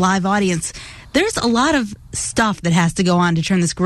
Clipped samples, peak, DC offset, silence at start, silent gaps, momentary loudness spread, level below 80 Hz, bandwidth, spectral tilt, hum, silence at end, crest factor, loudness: under 0.1%; -4 dBFS; under 0.1%; 0 s; none; 8 LU; -42 dBFS; 12.5 kHz; -4.5 dB/octave; none; 0 s; 14 dB; -17 LUFS